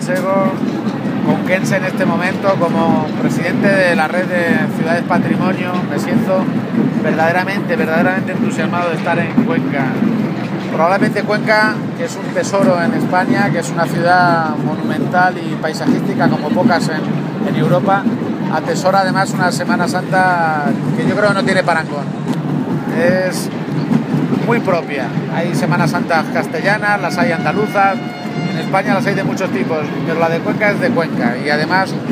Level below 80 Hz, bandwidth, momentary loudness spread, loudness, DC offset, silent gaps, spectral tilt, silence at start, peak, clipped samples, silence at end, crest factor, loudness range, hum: -58 dBFS; 15.5 kHz; 6 LU; -15 LUFS; under 0.1%; none; -6.5 dB/octave; 0 s; 0 dBFS; under 0.1%; 0 s; 14 dB; 2 LU; none